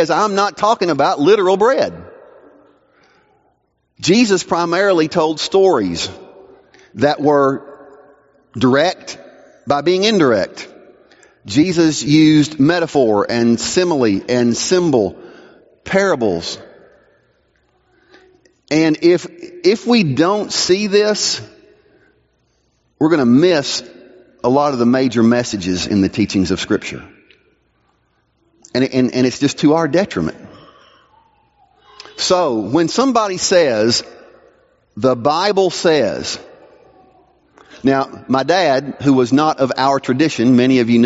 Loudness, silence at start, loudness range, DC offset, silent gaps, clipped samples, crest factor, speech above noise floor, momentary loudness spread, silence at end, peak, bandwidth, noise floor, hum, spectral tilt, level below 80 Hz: -15 LUFS; 0 s; 5 LU; under 0.1%; none; under 0.1%; 16 dB; 49 dB; 10 LU; 0 s; 0 dBFS; 8 kHz; -63 dBFS; none; -4.5 dB/octave; -54 dBFS